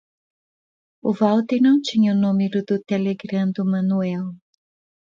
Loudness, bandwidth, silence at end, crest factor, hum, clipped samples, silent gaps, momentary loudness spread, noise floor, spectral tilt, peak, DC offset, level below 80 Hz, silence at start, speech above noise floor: -20 LUFS; 7.4 kHz; 0.7 s; 16 dB; none; under 0.1%; none; 9 LU; under -90 dBFS; -7.5 dB/octave; -6 dBFS; under 0.1%; -68 dBFS; 1.05 s; over 71 dB